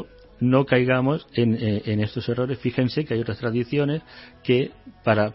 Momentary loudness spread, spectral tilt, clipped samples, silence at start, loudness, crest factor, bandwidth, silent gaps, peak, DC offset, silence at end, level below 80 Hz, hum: 7 LU; -11.5 dB/octave; under 0.1%; 0 s; -23 LUFS; 18 dB; 5.8 kHz; none; -6 dBFS; under 0.1%; 0 s; -54 dBFS; none